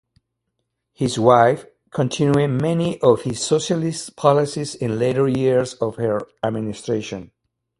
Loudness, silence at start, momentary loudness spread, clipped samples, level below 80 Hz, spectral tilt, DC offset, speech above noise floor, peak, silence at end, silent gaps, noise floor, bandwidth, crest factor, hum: -20 LUFS; 1 s; 10 LU; under 0.1%; -56 dBFS; -6 dB/octave; under 0.1%; 57 dB; 0 dBFS; 0.55 s; none; -76 dBFS; 11.5 kHz; 20 dB; none